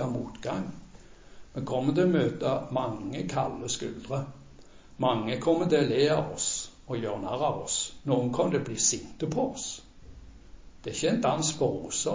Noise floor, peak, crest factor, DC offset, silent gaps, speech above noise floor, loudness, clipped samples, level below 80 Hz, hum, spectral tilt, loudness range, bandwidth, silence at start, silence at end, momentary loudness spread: -50 dBFS; -12 dBFS; 18 dB; under 0.1%; none; 22 dB; -29 LUFS; under 0.1%; -54 dBFS; none; -4.5 dB/octave; 3 LU; 7.8 kHz; 0 s; 0 s; 11 LU